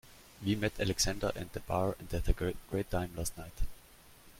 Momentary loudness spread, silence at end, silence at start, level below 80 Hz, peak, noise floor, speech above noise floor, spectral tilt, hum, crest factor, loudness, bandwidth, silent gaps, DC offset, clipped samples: 13 LU; 0 s; 0.05 s; -40 dBFS; -16 dBFS; -58 dBFS; 24 dB; -4.5 dB/octave; none; 20 dB; -36 LUFS; 16.5 kHz; none; under 0.1%; under 0.1%